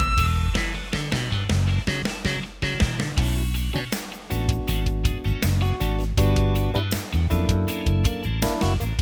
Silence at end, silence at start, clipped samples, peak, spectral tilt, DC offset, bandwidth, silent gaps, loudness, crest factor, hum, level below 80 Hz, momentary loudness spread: 0 s; 0 s; under 0.1%; -8 dBFS; -5.5 dB/octave; under 0.1%; over 20 kHz; none; -24 LUFS; 14 dB; none; -28 dBFS; 5 LU